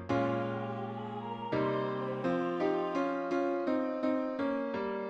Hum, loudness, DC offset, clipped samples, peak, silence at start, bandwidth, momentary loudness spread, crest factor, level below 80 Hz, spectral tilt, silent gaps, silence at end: none; -34 LUFS; under 0.1%; under 0.1%; -18 dBFS; 0 s; 7.8 kHz; 7 LU; 14 dB; -68 dBFS; -8 dB/octave; none; 0 s